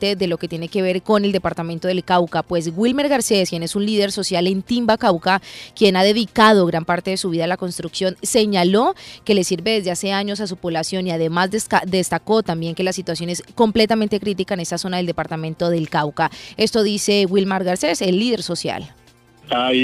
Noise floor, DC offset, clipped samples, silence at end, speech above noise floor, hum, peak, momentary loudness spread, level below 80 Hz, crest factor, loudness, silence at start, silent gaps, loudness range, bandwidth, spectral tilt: -49 dBFS; under 0.1%; under 0.1%; 0 s; 30 dB; none; 0 dBFS; 8 LU; -52 dBFS; 18 dB; -19 LUFS; 0 s; none; 4 LU; 15 kHz; -4.5 dB/octave